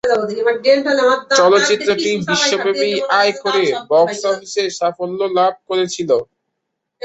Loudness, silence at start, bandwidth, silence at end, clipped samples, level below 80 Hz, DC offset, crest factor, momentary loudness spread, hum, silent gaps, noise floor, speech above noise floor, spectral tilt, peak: -16 LUFS; 0.05 s; 8.2 kHz; 0.8 s; under 0.1%; -62 dBFS; under 0.1%; 14 dB; 7 LU; none; none; -76 dBFS; 60 dB; -3 dB/octave; 0 dBFS